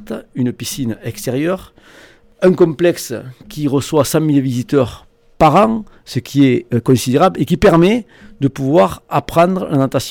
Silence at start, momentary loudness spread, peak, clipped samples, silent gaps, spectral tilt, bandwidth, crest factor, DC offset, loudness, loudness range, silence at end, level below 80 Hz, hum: 0 s; 12 LU; -2 dBFS; under 0.1%; none; -6.5 dB/octave; 18.5 kHz; 14 dB; under 0.1%; -15 LUFS; 4 LU; 0 s; -40 dBFS; none